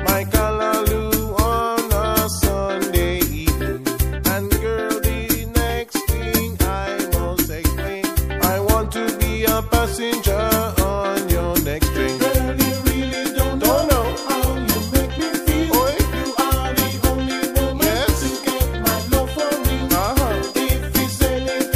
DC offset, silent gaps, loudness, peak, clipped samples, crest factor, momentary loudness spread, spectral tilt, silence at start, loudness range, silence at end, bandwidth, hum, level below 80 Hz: 0.1%; none; -19 LUFS; -2 dBFS; under 0.1%; 18 dB; 4 LU; -4.5 dB/octave; 0 s; 2 LU; 0 s; 15.5 kHz; none; -26 dBFS